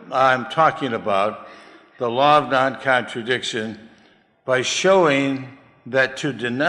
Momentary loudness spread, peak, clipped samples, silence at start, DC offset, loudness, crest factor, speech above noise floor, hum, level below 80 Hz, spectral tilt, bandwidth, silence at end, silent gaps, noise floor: 13 LU; -2 dBFS; under 0.1%; 0 s; under 0.1%; -19 LUFS; 18 dB; 36 dB; none; -66 dBFS; -4 dB/octave; 11.5 kHz; 0 s; none; -55 dBFS